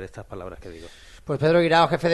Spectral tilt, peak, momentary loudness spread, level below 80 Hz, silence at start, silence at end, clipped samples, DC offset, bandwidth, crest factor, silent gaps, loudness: -6.5 dB/octave; -4 dBFS; 24 LU; -50 dBFS; 0 s; 0 s; under 0.1%; under 0.1%; 12 kHz; 18 dB; none; -20 LUFS